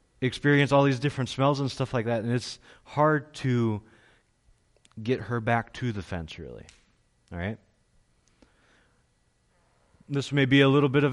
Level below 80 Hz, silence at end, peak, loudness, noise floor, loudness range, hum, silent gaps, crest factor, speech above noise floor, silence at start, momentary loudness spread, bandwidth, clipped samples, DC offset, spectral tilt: -56 dBFS; 0 s; -10 dBFS; -26 LUFS; -68 dBFS; 17 LU; none; none; 18 dB; 43 dB; 0.2 s; 18 LU; 11.5 kHz; under 0.1%; under 0.1%; -6.5 dB/octave